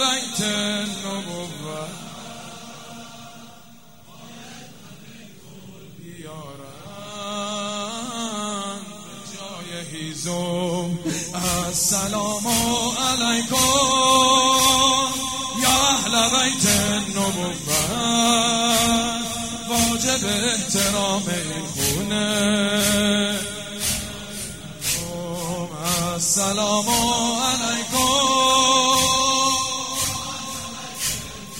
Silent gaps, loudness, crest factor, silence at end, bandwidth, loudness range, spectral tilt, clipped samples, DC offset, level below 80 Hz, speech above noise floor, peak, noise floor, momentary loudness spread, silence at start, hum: none; -20 LUFS; 20 dB; 0 s; 16 kHz; 17 LU; -2 dB/octave; under 0.1%; 0.4%; -48 dBFS; 27 dB; -4 dBFS; -48 dBFS; 20 LU; 0 s; none